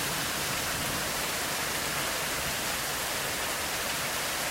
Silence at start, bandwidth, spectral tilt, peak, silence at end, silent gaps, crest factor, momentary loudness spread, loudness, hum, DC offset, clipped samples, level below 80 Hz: 0 s; 16 kHz; -1.5 dB/octave; -18 dBFS; 0 s; none; 14 dB; 1 LU; -29 LUFS; none; under 0.1%; under 0.1%; -52 dBFS